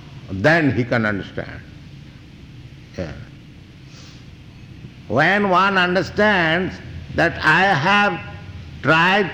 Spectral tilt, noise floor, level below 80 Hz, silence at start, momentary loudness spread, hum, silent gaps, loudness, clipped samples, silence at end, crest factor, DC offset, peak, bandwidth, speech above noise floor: -6 dB/octave; -41 dBFS; -46 dBFS; 0.05 s; 21 LU; none; none; -17 LUFS; under 0.1%; 0 s; 14 dB; under 0.1%; -6 dBFS; 19.5 kHz; 24 dB